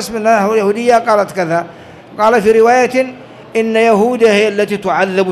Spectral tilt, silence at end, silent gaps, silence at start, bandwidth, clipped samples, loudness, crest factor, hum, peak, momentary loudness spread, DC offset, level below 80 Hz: -5 dB/octave; 0 s; none; 0 s; 13.5 kHz; under 0.1%; -12 LUFS; 10 dB; none; -2 dBFS; 9 LU; under 0.1%; -52 dBFS